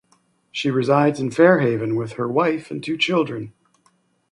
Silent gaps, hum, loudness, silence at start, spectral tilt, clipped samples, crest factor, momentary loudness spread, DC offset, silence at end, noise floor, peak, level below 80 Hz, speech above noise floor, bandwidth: none; none; -20 LUFS; 0.55 s; -6.5 dB/octave; under 0.1%; 18 dB; 12 LU; under 0.1%; 0.8 s; -63 dBFS; -2 dBFS; -64 dBFS; 44 dB; 11 kHz